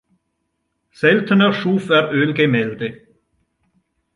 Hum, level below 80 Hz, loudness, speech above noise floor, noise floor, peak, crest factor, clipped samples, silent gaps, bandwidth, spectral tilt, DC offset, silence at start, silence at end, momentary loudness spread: none; -62 dBFS; -17 LUFS; 56 dB; -72 dBFS; -2 dBFS; 18 dB; under 0.1%; none; 11 kHz; -7.5 dB/octave; under 0.1%; 1 s; 1.2 s; 10 LU